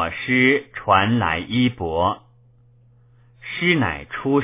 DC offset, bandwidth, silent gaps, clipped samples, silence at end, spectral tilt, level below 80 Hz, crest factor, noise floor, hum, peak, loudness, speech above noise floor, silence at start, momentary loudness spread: under 0.1%; 3.8 kHz; none; under 0.1%; 0 s; -9.5 dB/octave; -44 dBFS; 18 dB; -53 dBFS; none; -2 dBFS; -20 LUFS; 33 dB; 0 s; 10 LU